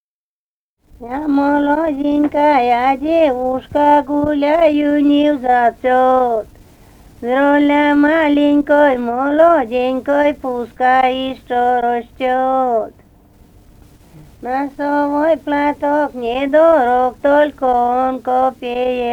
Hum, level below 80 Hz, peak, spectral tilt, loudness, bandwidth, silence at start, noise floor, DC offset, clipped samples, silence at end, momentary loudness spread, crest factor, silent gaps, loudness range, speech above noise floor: none; -46 dBFS; -2 dBFS; -6 dB/octave; -14 LUFS; 8 kHz; 1 s; under -90 dBFS; under 0.1%; under 0.1%; 0 s; 8 LU; 14 dB; none; 6 LU; over 76 dB